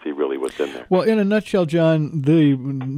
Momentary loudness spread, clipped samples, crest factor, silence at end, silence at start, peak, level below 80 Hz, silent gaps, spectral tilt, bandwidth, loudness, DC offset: 8 LU; under 0.1%; 12 dB; 0 s; 0.05 s; -6 dBFS; -60 dBFS; none; -8 dB/octave; 11.5 kHz; -19 LUFS; under 0.1%